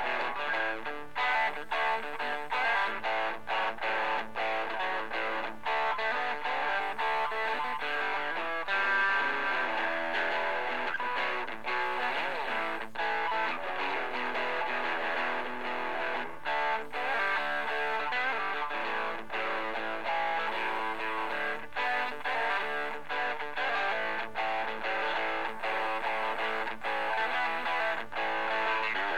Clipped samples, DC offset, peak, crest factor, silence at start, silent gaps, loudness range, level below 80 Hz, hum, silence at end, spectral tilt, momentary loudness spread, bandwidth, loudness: under 0.1%; 1%; -18 dBFS; 14 dB; 0 s; none; 2 LU; -68 dBFS; none; 0 s; -3 dB/octave; 4 LU; 16.5 kHz; -31 LUFS